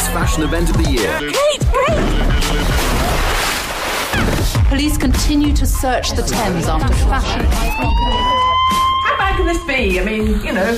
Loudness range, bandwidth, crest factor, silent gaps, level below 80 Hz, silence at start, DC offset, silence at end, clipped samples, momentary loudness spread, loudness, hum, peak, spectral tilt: 1 LU; 15.5 kHz; 8 dB; none; -18 dBFS; 0 s; under 0.1%; 0 s; under 0.1%; 3 LU; -16 LUFS; none; -6 dBFS; -4.5 dB/octave